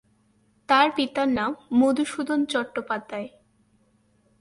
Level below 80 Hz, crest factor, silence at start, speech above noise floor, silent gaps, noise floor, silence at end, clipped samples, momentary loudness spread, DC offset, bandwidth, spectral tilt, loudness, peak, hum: -64 dBFS; 22 dB; 0.7 s; 41 dB; none; -64 dBFS; 1.15 s; under 0.1%; 12 LU; under 0.1%; 11.5 kHz; -4 dB/octave; -24 LUFS; -4 dBFS; none